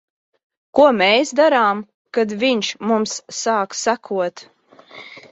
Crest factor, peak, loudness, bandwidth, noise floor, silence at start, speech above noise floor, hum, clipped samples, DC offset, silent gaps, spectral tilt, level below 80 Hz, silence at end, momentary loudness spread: 18 dB; -2 dBFS; -18 LUFS; 8.2 kHz; -42 dBFS; 0.75 s; 25 dB; none; under 0.1%; under 0.1%; 1.94-2.05 s; -3 dB/octave; -66 dBFS; 0.15 s; 11 LU